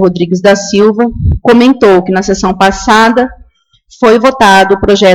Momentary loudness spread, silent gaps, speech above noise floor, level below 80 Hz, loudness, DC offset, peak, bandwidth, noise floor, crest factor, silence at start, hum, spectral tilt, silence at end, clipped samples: 6 LU; none; 40 dB; -26 dBFS; -7 LUFS; under 0.1%; 0 dBFS; 17 kHz; -47 dBFS; 8 dB; 0 s; none; -5 dB/octave; 0 s; 0.8%